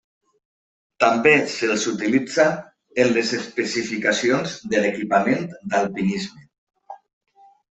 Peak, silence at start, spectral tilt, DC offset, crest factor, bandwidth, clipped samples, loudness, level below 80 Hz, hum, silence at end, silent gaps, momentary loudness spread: -2 dBFS; 1 s; -4 dB/octave; under 0.1%; 20 dB; 8.4 kHz; under 0.1%; -21 LUFS; -64 dBFS; none; 0.8 s; 6.58-6.67 s; 8 LU